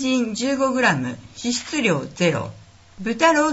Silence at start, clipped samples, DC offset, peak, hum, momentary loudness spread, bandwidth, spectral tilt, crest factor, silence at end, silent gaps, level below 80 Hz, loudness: 0 s; under 0.1%; under 0.1%; -2 dBFS; none; 11 LU; 8 kHz; -4 dB/octave; 18 dB; 0 s; none; -56 dBFS; -21 LUFS